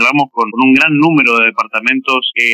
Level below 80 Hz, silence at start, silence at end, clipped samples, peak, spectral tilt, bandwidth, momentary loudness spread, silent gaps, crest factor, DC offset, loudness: -60 dBFS; 0 s; 0 s; under 0.1%; 0 dBFS; -5 dB/octave; 13 kHz; 5 LU; none; 12 dB; under 0.1%; -10 LUFS